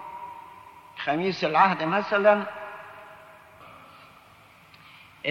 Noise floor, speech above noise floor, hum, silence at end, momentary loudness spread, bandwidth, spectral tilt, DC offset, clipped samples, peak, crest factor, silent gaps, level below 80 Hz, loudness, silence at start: -53 dBFS; 31 dB; none; 0 s; 26 LU; 12 kHz; -6 dB/octave; under 0.1%; under 0.1%; -6 dBFS; 22 dB; none; -70 dBFS; -24 LUFS; 0 s